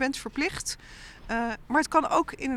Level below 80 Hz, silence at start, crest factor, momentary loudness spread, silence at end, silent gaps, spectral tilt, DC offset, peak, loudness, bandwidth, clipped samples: -50 dBFS; 0 s; 20 dB; 15 LU; 0 s; none; -3 dB/octave; under 0.1%; -8 dBFS; -27 LUFS; 15 kHz; under 0.1%